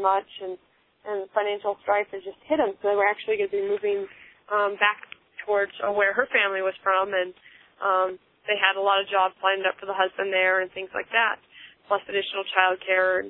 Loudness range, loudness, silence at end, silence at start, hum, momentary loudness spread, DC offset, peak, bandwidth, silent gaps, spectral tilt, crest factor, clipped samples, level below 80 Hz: 3 LU; -24 LUFS; 0 s; 0 s; none; 12 LU; under 0.1%; -2 dBFS; 4.1 kHz; none; -6 dB/octave; 22 dB; under 0.1%; -70 dBFS